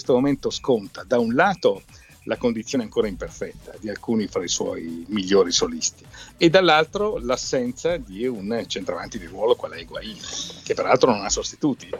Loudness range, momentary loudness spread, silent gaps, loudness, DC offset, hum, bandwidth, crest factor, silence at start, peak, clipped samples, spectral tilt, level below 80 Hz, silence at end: 6 LU; 15 LU; none; -23 LUFS; under 0.1%; none; 13.5 kHz; 20 dB; 0 s; -2 dBFS; under 0.1%; -3.5 dB/octave; -48 dBFS; 0 s